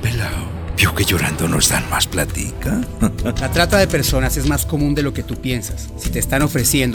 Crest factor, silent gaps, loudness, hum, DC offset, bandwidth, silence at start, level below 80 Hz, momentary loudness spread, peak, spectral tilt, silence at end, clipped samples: 18 dB; none; -18 LUFS; none; under 0.1%; over 20 kHz; 0 s; -28 dBFS; 9 LU; 0 dBFS; -4 dB/octave; 0 s; under 0.1%